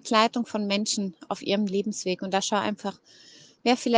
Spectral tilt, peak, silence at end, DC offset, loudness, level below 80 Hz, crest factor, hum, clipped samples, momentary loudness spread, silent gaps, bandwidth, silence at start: -3.5 dB/octave; -4 dBFS; 0 s; under 0.1%; -27 LUFS; -72 dBFS; 22 dB; none; under 0.1%; 9 LU; none; 10 kHz; 0.05 s